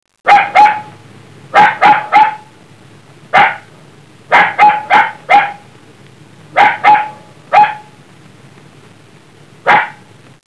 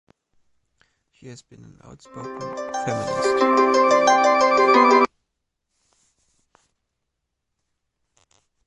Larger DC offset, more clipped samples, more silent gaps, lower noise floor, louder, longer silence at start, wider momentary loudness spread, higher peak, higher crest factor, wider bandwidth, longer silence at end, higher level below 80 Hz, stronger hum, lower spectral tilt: first, 0.3% vs under 0.1%; first, 0.5% vs under 0.1%; neither; second, -41 dBFS vs -79 dBFS; first, -10 LUFS vs -18 LUFS; second, 0.25 s vs 1.25 s; second, 13 LU vs 17 LU; about the same, 0 dBFS vs -2 dBFS; second, 12 dB vs 20 dB; about the same, 11 kHz vs 11.5 kHz; second, 0.55 s vs 3.6 s; about the same, -58 dBFS vs -62 dBFS; neither; about the same, -3.5 dB/octave vs -4 dB/octave